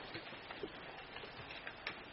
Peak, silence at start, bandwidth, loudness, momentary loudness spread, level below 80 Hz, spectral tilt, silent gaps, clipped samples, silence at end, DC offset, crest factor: -26 dBFS; 0 s; 5.8 kHz; -48 LUFS; 3 LU; -68 dBFS; -1.5 dB/octave; none; under 0.1%; 0 s; under 0.1%; 22 dB